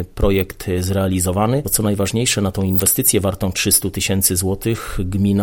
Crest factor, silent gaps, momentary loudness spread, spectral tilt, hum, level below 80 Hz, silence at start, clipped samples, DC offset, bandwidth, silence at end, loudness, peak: 18 dB; none; 7 LU; -4 dB/octave; none; -32 dBFS; 0 s; under 0.1%; under 0.1%; 17 kHz; 0 s; -17 LUFS; 0 dBFS